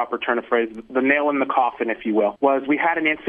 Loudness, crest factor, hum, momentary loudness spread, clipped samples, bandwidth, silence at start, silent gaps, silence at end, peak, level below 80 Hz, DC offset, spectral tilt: -21 LUFS; 16 dB; none; 4 LU; under 0.1%; 3.8 kHz; 0 s; none; 0 s; -6 dBFS; -62 dBFS; under 0.1%; -7.5 dB/octave